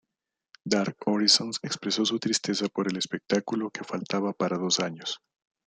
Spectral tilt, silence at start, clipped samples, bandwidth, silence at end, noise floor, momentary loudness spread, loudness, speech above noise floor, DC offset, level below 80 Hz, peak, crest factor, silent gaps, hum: -3.5 dB/octave; 0.65 s; under 0.1%; 9.6 kHz; 0.5 s; -87 dBFS; 12 LU; -27 LUFS; 59 dB; under 0.1%; -72 dBFS; -6 dBFS; 22 dB; none; none